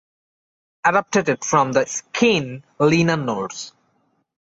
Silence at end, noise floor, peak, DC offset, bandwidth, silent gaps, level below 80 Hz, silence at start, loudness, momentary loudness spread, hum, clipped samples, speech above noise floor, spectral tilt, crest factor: 0.75 s; -66 dBFS; -4 dBFS; under 0.1%; 8.2 kHz; none; -58 dBFS; 0.85 s; -19 LUFS; 12 LU; none; under 0.1%; 47 dB; -4.5 dB/octave; 18 dB